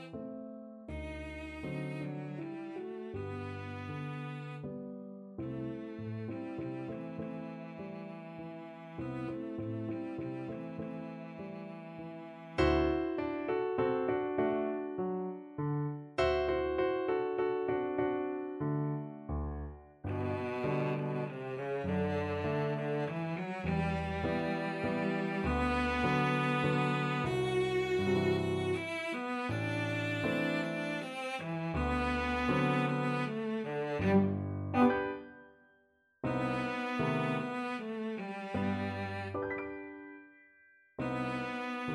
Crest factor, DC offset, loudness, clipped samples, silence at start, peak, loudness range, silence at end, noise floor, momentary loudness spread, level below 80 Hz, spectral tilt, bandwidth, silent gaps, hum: 20 dB; under 0.1%; -35 LUFS; under 0.1%; 0 s; -16 dBFS; 10 LU; 0 s; -71 dBFS; 14 LU; -52 dBFS; -7.5 dB/octave; 12 kHz; none; none